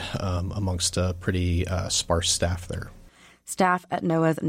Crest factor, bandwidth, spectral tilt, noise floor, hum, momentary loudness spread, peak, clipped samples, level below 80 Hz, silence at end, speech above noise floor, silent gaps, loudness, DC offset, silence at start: 16 dB; 15.5 kHz; -4 dB/octave; -52 dBFS; none; 13 LU; -10 dBFS; under 0.1%; -42 dBFS; 0 s; 27 dB; none; -25 LUFS; under 0.1%; 0 s